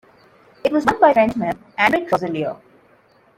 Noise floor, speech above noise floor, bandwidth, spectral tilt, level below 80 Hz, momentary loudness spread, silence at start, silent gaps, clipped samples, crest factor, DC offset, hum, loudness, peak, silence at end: -55 dBFS; 37 dB; 16 kHz; -6 dB/octave; -54 dBFS; 11 LU; 0.65 s; none; under 0.1%; 18 dB; under 0.1%; none; -18 LUFS; -2 dBFS; 0.8 s